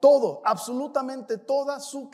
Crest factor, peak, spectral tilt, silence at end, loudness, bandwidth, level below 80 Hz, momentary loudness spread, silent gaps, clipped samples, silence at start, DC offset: 18 dB; -6 dBFS; -4.5 dB/octave; 0.05 s; -26 LUFS; 14 kHz; -88 dBFS; 11 LU; none; under 0.1%; 0 s; under 0.1%